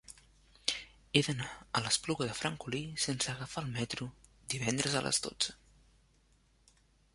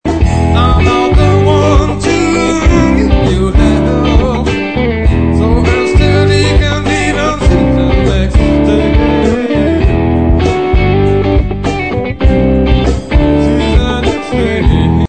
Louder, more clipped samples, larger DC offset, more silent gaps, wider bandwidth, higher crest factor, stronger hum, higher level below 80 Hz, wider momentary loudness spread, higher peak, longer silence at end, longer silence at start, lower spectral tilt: second, -34 LUFS vs -10 LUFS; second, under 0.1% vs 1%; second, under 0.1% vs 2%; neither; first, 11.5 kHz vs 9 kHz; first, 28 dB vs 10 dB; neither; second, -62 dBFS vs -14 dBFS; first, 9 LU vs 4 LU; second, -10 dBFS vs 0 dBFS; first, 1.6 s vs 0.05 s; about the same, 0.1 s vs 0.05 s; second, -3 dB/octave vs -7 dB/octave